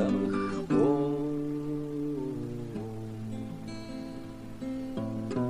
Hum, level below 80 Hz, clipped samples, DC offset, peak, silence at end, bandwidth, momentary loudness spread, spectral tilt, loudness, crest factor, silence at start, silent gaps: none; -54 dBFS; under 0.1%; 0.3%; -14 dBFS; 0 s; 12 kHz; 14 LU; -8 dB/octave; -33 LUFS; 18 dB; 0 s; none